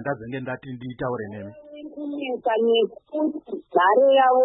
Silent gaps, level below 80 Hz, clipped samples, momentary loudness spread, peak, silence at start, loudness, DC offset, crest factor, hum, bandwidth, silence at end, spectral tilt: none; -62 dBFS; under 0.1%; 19 LU; -6 dBFS; 0 s; -23 LUFS; under 0.1%; 16 dB; none; 4 kHz; 0 s; -10 dB/octave